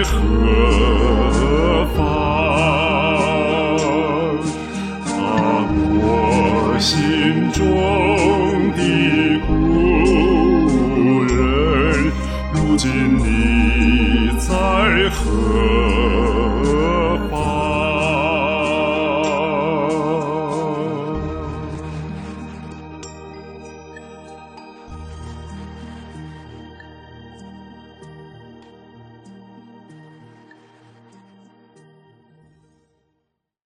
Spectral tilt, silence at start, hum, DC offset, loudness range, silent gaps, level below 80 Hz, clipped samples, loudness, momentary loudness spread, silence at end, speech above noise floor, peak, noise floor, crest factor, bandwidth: -6 dB/octave; 0 s; none; under 0.1%; 21 LU; none; -26 dBFS; under 0.1%; -17 LUFS; 20 LU; 3.75 s; 60 dB; -2 dBFS; -74 dBFS; 16 dB; 13 kHz